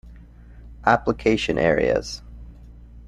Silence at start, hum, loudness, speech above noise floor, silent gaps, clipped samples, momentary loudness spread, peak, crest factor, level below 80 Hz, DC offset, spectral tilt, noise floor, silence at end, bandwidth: 0.05 s; none; -21 LUFS; 24 dB; none; under 0.1%; 10 LU; -2 dBFS; 22 dB; -40 dBFS; under 0.1%; -5.5 dB/octave; -44 dBFS; 0 s; 12 kHz